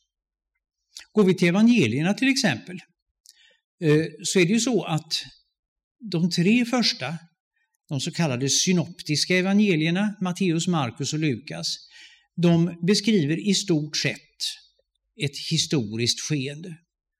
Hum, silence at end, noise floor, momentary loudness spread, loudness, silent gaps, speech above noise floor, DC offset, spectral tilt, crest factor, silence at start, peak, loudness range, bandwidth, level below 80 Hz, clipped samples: none; 0.45 s; -69 dBFS; 11 LU; -23 LUFS; 3.02-3.24 s, 3.64-3.78 s, 5.59-5.76 s, 5.84-5.95 s, 7.40-7.51 s; 46 dB; under 0.1%; -4.5 dB/octave; 16 dB; 0.95 s; -8 dBFS; 3 LU; 15 kHz; -70 dBFS; under 0.1%